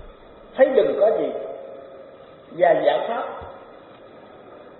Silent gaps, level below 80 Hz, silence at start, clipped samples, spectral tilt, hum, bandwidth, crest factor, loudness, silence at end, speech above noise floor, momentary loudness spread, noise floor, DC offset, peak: none; -56 dBFS; 0.05 s; under 0.1%; -3 dB/octave; none; 4.2 kHz; 20 dB; -20 LUFS; 0.15 s; 26 dB; 23 LU; -45 dBFS; under 0.1%; -2 dBFS